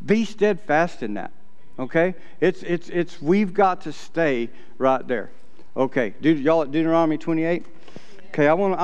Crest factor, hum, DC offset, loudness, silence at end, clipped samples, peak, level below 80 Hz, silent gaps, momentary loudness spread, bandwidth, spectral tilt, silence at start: 18 dB; none; 3%; -22 LUFS; 0 s; under 0.1%; -4 dBFS; -64 dBFS; none; 11 LU; 8.8 kHz; -7 dB/octave; 0 s